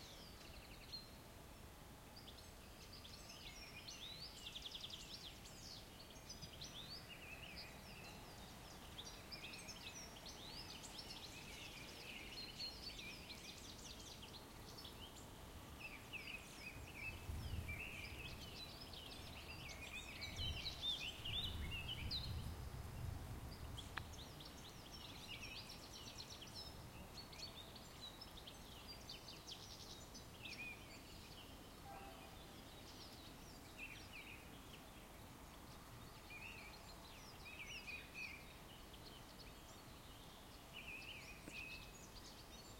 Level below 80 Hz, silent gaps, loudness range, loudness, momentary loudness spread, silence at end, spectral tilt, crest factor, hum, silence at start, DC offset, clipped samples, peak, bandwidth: -62 dBFS; none; 9 LU; -53 LUFS; 10 LU; 0 s; -3 dB/octave; 26 dB; none; 0 s; under 0.1%; under 0.1%; -26 dBFS; 16.5 kHz